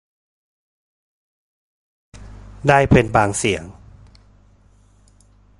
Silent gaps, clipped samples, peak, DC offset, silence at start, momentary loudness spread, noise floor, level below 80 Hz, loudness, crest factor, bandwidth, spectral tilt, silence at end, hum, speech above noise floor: none; under 0.1%; 0 dBFS; under 0.1%; 2.2 s; 12 LU; -53 dBFS; -40 dBFS; -17 LUFS; 22 dB; 11.5 kHz; -5.5 dB/octave; 1.9 s; 50 Hz at -45 dBFS; 37 dB